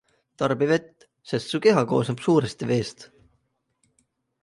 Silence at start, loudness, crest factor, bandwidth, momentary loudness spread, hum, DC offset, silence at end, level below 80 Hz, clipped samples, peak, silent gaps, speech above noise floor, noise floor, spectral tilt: 0.4 s; -23 LUFS; 20 dB; 11.5 kHz; 9 LU; none; under 0.1%; 1.35 s; -62 dBFS; under 0.1%; -6 dBFS; none; 49 dB; -72 dBFS; -6 dB/octave